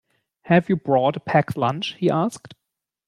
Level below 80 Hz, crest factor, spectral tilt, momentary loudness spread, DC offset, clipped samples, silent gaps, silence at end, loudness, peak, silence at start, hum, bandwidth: -62 dBFS; 18 dB; -7 dB/octave; 5 LU; under 0.1%; under 0.1%; none; 0.55 s; -21 LUFS; -4 dBFS; 0.45 s; none; 12.5 kHz